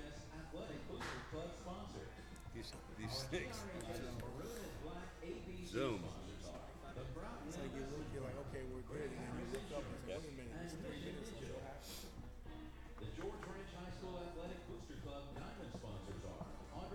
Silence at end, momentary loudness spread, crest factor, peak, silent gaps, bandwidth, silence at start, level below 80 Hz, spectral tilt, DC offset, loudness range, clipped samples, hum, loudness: 0 s; 7 LU; 22 dB; -28 dBFS; none; over 20 kHz; 0 s; -56 dBFS; -5 dB/octave; under 0.1%; 4 LU; under 0.1%; none; -49 LUFS